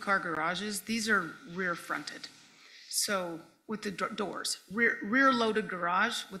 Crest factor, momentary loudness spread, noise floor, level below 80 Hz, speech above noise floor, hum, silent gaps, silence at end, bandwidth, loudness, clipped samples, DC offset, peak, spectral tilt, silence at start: 18 dB; 15 LU; -55 dBFS; -74 dBFS; 24 dB; none; none; 0 s; 16 kHz; -31 LUFS; under 0.1%; under 0.1%; -14 dBFS; -2.5 dB/octave; 0 s